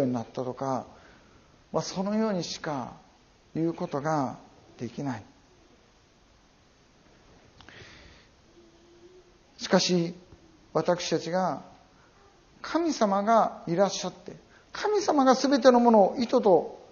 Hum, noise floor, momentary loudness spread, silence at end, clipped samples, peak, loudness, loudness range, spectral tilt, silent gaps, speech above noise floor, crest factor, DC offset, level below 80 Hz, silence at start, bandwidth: none; -60 dBFS; 20 LU; 0.15 s; under 0.1%; -6 dBFS; -26 LUFS; 13 LU; -4.5 dB/octave; none; 35 dB; 22 dB; under 0.1%; -64 dBFS; 0 s; 7.2 kHz